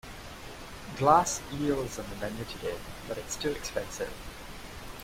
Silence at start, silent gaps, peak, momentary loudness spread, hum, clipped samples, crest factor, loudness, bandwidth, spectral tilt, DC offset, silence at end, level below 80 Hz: 0.05 s; none; -8 dBFS; 20 LU; none; under 0.1%; 24 dB; -31 LUFS; 16 kHz; -4 dB/octave; under 0.1%; 0 s; -48 dBFS